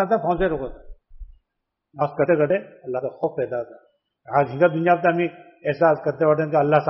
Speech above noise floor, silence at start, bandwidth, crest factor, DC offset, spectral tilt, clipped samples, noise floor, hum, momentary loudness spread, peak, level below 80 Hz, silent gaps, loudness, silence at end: 59 dB; 0 s; 5.8 kHz; 18 dB; under 0.1%; -6.5 dB/octave; under 0.1%; -80 dBFS; none; 11 LU; -4 dBFS; -46 dBFS; none; -22 LUFS; 0 s